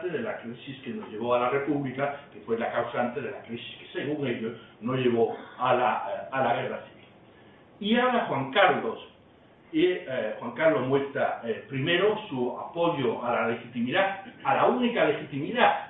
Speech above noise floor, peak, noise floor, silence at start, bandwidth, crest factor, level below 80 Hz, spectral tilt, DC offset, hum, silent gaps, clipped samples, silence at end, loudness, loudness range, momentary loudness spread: 28 dB; -6 dBFS; -56 dBFS; 0 s; 4.1 kHz; 20 dB; -70 dBFS; -9.5 dB/octave; under 0.1%; none; none; under 0.1%; 0 s; -27 LUFS; 3 LU; 13 LU